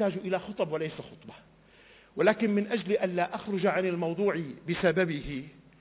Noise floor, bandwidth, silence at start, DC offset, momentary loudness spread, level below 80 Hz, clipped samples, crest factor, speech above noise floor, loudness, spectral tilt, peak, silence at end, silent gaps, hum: -58 dBFS; 4 kHz; 0 s; under 0.1%; 14 LU; -58 dBFS; under 0.1%; 18 dB; 28 dB; -29 LUFS; -10.5 dB/octave; -12 dBFS; 0.3 s; none; none